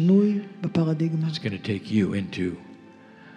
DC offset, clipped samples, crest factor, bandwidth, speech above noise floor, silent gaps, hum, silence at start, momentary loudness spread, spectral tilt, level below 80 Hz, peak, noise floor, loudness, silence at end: under 0.1%; under 0.1%; 14 dB; 9.4 kHz; 23 dB; none; none; 0 s; 9 LU; -8 dB/octave; -64 dBFS; -10 dBFS; -48 dBFS; -25 LUFS; 0 s